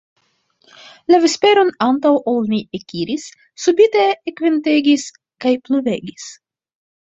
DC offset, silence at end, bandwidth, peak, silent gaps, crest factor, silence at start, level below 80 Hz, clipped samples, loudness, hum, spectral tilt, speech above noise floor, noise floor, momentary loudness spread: under 0.1%; 0.7 s; 8 kHz; -2 dBFS; none; 16 dB; 1.1 s; -62 dBFS; under 0.1%; -16 LUFS; none; -4 dB/octave; 45 dB; -61 dBFS; 16 LU